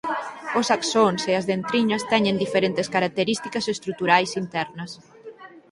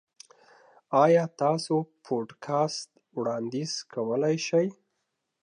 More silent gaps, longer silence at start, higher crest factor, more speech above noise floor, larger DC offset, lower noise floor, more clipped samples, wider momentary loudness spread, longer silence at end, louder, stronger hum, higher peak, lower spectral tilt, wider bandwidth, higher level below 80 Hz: neither; second, 0.05 s vs 0.9 s; about the same, 22 dB vs 20 dB; second, 21 dB vs 54 dB; neither; second, -43 dBFS vs -80 dBFS; neither; about the same, 12 LU vs 11 LU; second, 0.1 s vs 0.7 s; first, -23 LUFS vs -27 LUFS; neither; first, -2 dBFS vs -10 dBFS; second, -4 dB/octave vs -5.5 dB/octave; about the same, 11.5 kHz vs 10.5 kHz; first, -64 dBFS vs -82 dBFS